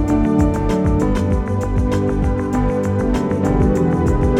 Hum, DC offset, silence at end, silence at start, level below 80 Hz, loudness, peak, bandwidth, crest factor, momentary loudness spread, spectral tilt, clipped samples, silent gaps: none; under 0.1%; 0 s; 0 s; -22 dBFS; -18 LUFS; -2 dBFS; 12.5 kHz; 14 dB; 3 LU; -8.5 dB/octave; under 0.1%; none